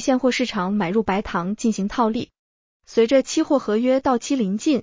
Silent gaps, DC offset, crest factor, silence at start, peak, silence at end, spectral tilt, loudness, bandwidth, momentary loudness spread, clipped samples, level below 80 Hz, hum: 2.39-2.80 s; under 0.1%; 16 dB; 0 s; -6 dBFS; 0 s; -5 dB/octave; -21 LUFS; 7.6 kHz; 5 LU; under 0.1%; -50 dBFS; none